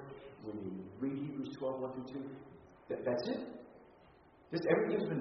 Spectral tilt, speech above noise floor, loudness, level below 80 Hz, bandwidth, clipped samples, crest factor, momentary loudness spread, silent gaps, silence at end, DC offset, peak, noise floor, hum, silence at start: -6 dB/octave; 26 dB; -39 LUFS; -74 dBFS; 6 kHz; under 0.1%; 22 dB; 20 LU; none; 0 s; under 0.1%; -16 dBFS; -63 dBFS; none; 0 s